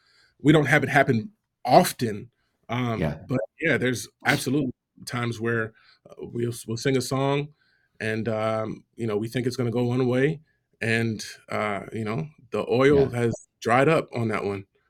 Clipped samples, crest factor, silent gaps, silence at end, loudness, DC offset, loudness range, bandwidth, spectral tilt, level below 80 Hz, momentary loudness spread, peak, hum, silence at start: under 0.1%; 22 dB; none; 0.25 s; -25 LUFS; under 0.1%; 5 LU; 18.5 kHz; -6 dB/octave; -58 dBFS; 13 LU; -2 dBFS; none; 0.45 s